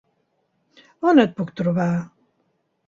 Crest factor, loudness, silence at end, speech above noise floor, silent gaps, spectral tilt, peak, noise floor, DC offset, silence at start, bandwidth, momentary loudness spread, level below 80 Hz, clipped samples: 22 dB; -20 LUFS; 0.8 s; 51 dB; none; -8 dB/octave; -2 dBFS; -69 dBFS; under 0.1%; 1 s; 7.4 kHz; 11 LU; -62 dBFS; under 0.1%